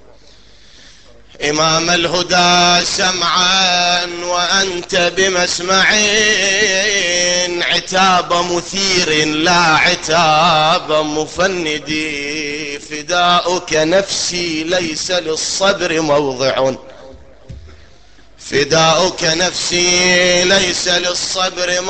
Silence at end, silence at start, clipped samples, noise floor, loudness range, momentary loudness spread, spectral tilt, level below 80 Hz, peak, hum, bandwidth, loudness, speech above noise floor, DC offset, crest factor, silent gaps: 0 s; 1.4 s; under 0.1%; -46 dBFS; 5 LU; 8 LU; -2 dB/octave; -44 dBFS; 0 dBFS; none; 9 kHz; -13 LUFS; 31 dB; 0.8%; 14 dB; none